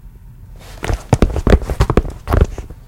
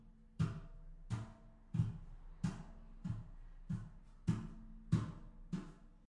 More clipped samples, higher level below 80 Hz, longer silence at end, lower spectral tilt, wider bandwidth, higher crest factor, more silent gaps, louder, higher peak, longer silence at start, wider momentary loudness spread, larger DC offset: first, 0.3% vs under 0.1%; first, -20 dBFS vs -56 dBFS; about the same, 0.15 s vs 0.05 s; about the same, -7 dB/octave vs -8 dB/octave; first, 16 kHz vs 11 kHz; second, 16 dB vs 22 dB; neither; first, -17 LUFS vs -44 LUFS; first, 0 dBFS vs -22 dBFS; about the same, 0.05 s vs 0 s; second, 9 LU vs 20 LU; neither